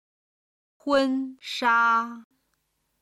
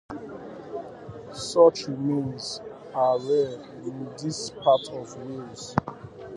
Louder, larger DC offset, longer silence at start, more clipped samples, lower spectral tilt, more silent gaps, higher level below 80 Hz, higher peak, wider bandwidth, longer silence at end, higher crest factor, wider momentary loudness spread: about the same, -24 LUFS vs -26 LUFS; neither; first, 0.85 s vs 0.1 s; neither; second, -3 dB/octave vs -5.5 dB/octave; neither; second, -70 dBFS vs -60 dBFS; second, -10 dBFS vs -4 dBFS; first, 13 kHz vs 11.5 kHz; first, 0.8 s vs 0 s; second, 18 dB vs 24 dB; second, 14 LU vs 20 LU